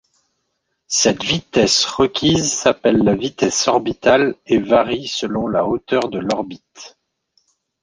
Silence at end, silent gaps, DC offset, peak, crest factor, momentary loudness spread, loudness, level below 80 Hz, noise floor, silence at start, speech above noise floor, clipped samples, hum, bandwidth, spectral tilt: 0.95 s; none; under 0.1%; 0 dBFS; 18 dB; 7 LU; -17 LUFS; -48 dBFS; -72 dBFS; 0.9 s; 55 dB; under 0.1%; none; 10.5 kHz; -3.5 dB/octave